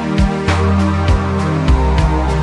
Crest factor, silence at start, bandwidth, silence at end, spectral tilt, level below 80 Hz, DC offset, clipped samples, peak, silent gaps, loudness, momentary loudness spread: 12 dB; 0 s; 11 kHz; 0 s; -7 dB/octave; -18 dBFS; under 0.1%; under 0.1%; 0 dBFS; none; -15 LUFS; 2 LU